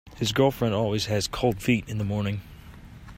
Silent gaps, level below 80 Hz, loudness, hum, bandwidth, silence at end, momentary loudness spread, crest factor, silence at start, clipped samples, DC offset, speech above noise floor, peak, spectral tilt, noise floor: none; -46 dBFS; -26 LUFS; none; 16 kHz; 0 s; 11 LU; 18 dB; 0.05 s; under 0.1%; under 0.1%; 20 dB; -8 dBFS; -5.5 dB/octave; -45 dBFS